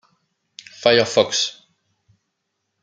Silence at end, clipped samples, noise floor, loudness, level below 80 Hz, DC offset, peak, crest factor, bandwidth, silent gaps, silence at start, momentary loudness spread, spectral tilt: 1.3 s; under 0.1%; -76 dBFS; -18 LUFS; -62 dBFS; under 0.1%; -2 dBFS; 22 dB; 9.6 kHz; none; 0.8 s; 10 LU; -2.5 dB/octave